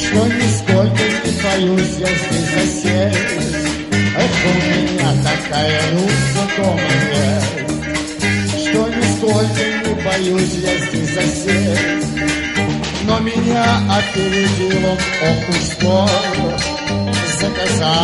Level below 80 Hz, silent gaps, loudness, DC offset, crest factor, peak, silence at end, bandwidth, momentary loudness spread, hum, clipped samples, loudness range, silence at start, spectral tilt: -34 dBFS; none; -16 LUFS; under 0.1%; 14 dB; 0 dBFS; 0 s; 11.5 kHz; 4 LU; none; under 0.1%; 1 LU; 0 s; -4.5 dB/octave